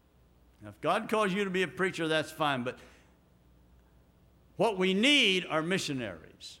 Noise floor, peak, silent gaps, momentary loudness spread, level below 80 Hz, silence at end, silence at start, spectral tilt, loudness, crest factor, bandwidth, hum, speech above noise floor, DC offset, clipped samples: -63 dBFS; -12 dBFS; none; 14 LU; -66 dBFS; 0.05 s; 0.6 s; -4 dB/octave; -29 LUFS; 20 dB; 16.5 kHz; none; 33 dB; under 0.1%; under 0.1%